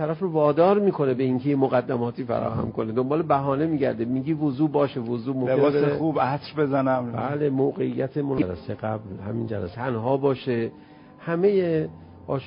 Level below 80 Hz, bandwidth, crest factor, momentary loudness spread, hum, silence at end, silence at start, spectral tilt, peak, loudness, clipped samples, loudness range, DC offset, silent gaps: -54 dBFS; 5.4 kHz; 16 dB; 9 LU; none; 0 s; 0 s; -12.5 dB/octave; -8 dBFS; -24 LUFS; under 0.1%; 4 LU; under 0.1%; none